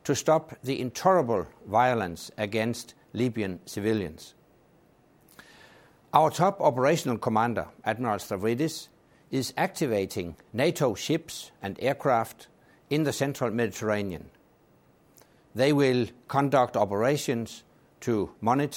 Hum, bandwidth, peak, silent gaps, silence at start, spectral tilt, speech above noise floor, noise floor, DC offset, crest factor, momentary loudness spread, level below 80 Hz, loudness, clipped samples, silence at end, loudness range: none; 17 kHz; -4 dBFS; none; 0.05 s; -5.5 dB/octave; 34 dB; -61 dBFS; under 0.1%; 24 dB; 12 LU; -62 dBFS; -27 LUFS; under 0.1%; 0 s; 5 LU